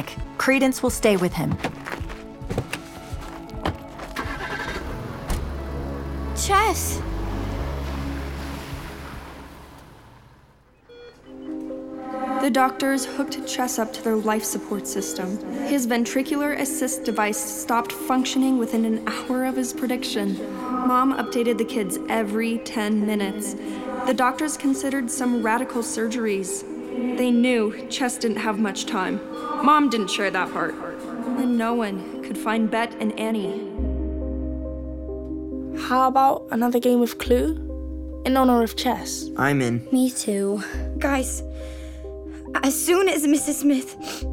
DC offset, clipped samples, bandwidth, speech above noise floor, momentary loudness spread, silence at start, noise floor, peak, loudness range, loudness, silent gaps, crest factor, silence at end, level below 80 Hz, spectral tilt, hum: under 0.1%; under 0.1%; 17.5 kHz; 32 dB; 13 LU; 0 s; -54 dBFS; -4 dBFS; 9 LU; -24 LUFS; none; 20 dB; 0 s; -38 dBFS; -4.5 dB/octave; none